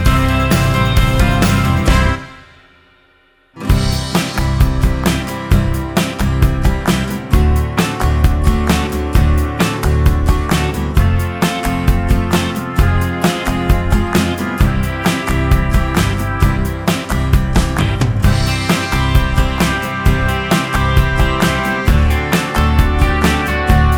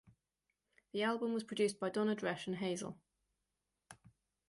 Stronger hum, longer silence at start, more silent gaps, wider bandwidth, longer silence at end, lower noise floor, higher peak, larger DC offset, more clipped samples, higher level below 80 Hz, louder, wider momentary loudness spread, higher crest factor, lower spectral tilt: neither; second, 0 s vs 0.95 s; neither; first, over 20 kHz vs 11.5 kHz; second, 0 s vs 0.55 s; second, -52 dBFS vs -88 dBFS; first, 0 dBFS vs -24 dBFS; neither; neither; first, -18 dBFS vs -80 dBFS; first, -15 LUFS vs -38 LUFS; second, 4 LU vs 9 LU; about the same, 14 dB vs 18 dB; about the same, -5.5 dB/octave vs -5 dB/octave